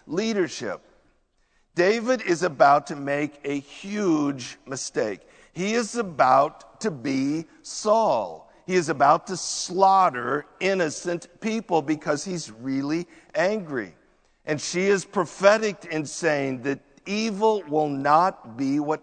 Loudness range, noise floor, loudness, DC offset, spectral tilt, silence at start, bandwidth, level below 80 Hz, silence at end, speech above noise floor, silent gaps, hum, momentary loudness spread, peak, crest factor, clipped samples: 5 LU; -66 dBFS; -24 LUFS; under 0.1%; -4.5 dB/octave; 0.05 s; 9.4 kHz; -64 dBFS; 0.05 s; 42 dB; none; none; 13 LU; -2 dBFS; 22 dB; under 0.1%